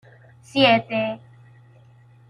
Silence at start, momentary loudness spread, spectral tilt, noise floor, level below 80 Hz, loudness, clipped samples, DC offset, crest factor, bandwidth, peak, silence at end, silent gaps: 0.55 s; 13 LU; -5.5 dB/octave; -51 dBFS; -64 dBFS; -20 LUFS; under 0.1%; under 0.1%; 20 dB; 11 kHz; -4 dBFS; 1.1 s; none